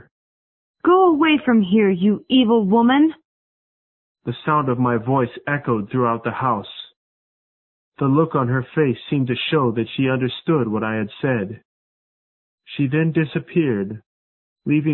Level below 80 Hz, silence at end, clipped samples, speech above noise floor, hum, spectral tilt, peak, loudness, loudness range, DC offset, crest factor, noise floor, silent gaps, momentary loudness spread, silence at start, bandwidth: -58 dBFS; 0 s; under 0.1%; over 71 dB; none; -12 dB/octave; -4 dBFS; -19 LUFS; 7 LU; under 0.1%; 16 dB; under -90 dBFS; 3.25-4.15 s, 6.96-7.92 s, 11.65-12.58 s, 14.06-14.56 s; 10 LU; 0.85 s; 4.2 kHz